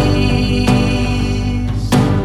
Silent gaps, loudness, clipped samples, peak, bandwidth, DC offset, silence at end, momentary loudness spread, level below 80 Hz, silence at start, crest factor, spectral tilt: none; -15 LUFS; under 0.1%; -2 dBFS; 14 kHz; under 0.1%; 0 s; 5 LU; -22 dBFS; 0 s; 12 dB; -6.5 dB/octave